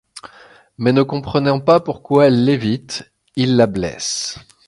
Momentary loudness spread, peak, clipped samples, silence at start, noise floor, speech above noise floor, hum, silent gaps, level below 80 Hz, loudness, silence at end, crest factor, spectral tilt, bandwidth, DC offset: 16 LU; 0 dBFS; under 0.1%; 0.15 s; -46 dBFS; 30 dB; none; none; -48 dBFS; -17 LUFS; 0.3 s; 16 dB; -5.5 dB/octave; 11.5 kHz; under 0.1%